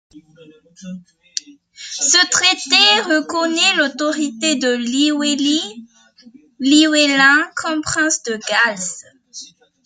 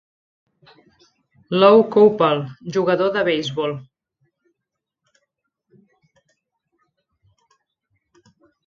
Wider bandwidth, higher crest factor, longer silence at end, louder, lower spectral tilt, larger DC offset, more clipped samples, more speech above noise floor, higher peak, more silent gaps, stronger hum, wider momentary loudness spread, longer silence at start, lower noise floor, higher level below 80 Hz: first, 9.6 kHz vs 7.2 kHz; about the same, 18 dB vs 22 dB; second, 0.4 s vs 4.85 s; first, -14 LUFS vs -17 LUFS; second, -1 dB/octave vs -6.5 dB/octave; neither; neither; second, 30 dB vs 65 dB; about the same, 0 dBFS vs 0 dBFS; neither; neither; first, 23 LU vs 13 LU; second, 0.15 s vs 1.5 s; second, -47 dBFS vs -82 dBFS; about the same, -64 dBFS vs -66 dBFS